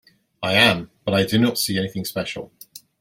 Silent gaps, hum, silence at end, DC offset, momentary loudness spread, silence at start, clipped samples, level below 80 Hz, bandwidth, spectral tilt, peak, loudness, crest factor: none; none; 0.25 s; under 0.1%; 14 LU; 0.4 s; under 0.1%; -56 dBFS; 16.5 kHz; -4 dB/octave; -2 dBFS; -20 LUFS; 22 dB